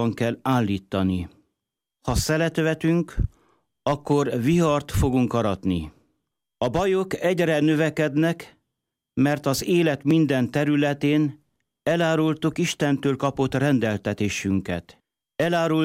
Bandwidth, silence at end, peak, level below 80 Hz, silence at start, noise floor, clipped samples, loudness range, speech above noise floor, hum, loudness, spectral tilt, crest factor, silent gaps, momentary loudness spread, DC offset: 16 kHz; 0 s; -10 dBFS; -40 dBFS; 0 s; -84 dBFS; under 0.1%; 2 LU; 62 dB; none; -23 LUFS; -6 dB/octave; 12 dB; none; 8 LU; under 0.1%